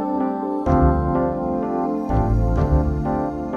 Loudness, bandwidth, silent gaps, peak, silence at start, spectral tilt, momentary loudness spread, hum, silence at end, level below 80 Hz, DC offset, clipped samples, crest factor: -21 LUFS; 6.6 kHz; none; -6 dBFS; 0 s; -10.5 dB/octave; 6 LU; none; 0 s; -26 dBFS; under 0.1%; under 0.1%; 14 dB